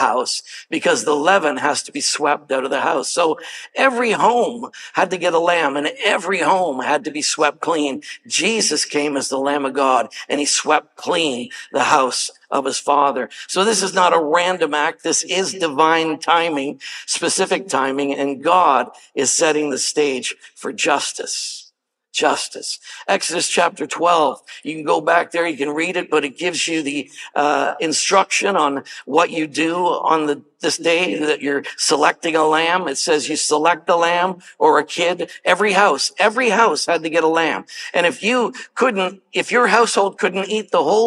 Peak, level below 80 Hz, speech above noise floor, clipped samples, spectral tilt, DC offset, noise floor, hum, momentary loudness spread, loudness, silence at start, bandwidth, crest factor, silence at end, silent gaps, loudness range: 0 dBFS; -80 dBFS; 38 dB; under 0.1%; -2 dB/octave; under 0.1%; -57 dBFS; none; 8 LU; -18 LUFS; 0 s; 14 kHz; 18 dB; 0 s; none; 3 LU